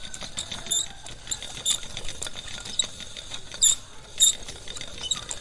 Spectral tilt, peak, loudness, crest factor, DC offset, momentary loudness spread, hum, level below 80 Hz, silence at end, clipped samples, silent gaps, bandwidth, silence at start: 0.5 dB/octave; -6 dBFS; -25 LUFS; 22 dB; under 0.1%; 17 LU; none; -48 dBFS; 0 s; under 0.1%; none; 12 kHz; 0 s